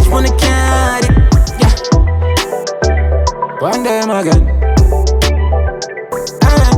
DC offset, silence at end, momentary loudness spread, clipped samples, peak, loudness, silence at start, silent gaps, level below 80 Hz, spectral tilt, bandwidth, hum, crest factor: under 0.1%; 0 s; 7 LU; under 0.1%; 0 dBFS; -13 LUFS; 0 s; none; -14 dBFS; -5.5 dB/octave; 15.5 kHz; none; 10 dB